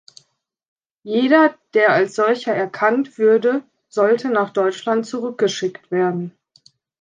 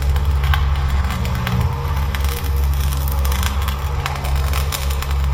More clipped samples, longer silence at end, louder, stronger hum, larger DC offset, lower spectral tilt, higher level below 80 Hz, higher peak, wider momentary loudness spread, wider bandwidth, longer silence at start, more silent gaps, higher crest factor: neither; first, 0.7 s vs 0 s; about the same, -18 LUFS vs -20 LUFS; neither; neither; about the same, -5.5 dB/octave vs -5 dB/octave; second, -74 dBFS vs -20 dBFS; about the same, -2 dBFS vs 0 dBFS; first, 10 LU vs 3 LU; second, 9.4 kHz vs 17 kHz; first, 1.05 s vs 0 s; neither; about the same, 18 dB vs 18 dB